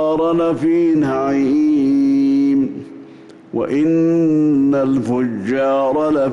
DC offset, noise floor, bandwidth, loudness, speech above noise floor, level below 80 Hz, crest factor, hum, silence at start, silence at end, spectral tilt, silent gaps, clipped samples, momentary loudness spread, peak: under 0.1%; -40 dBFS; 7.6 kHz; -16 LUFS; 25 dB; -54 dBFS; 6 dB; none; 0 s; 0 s; -8 dB/octave; none; under 0.1%; 5 LU; -8 dBFS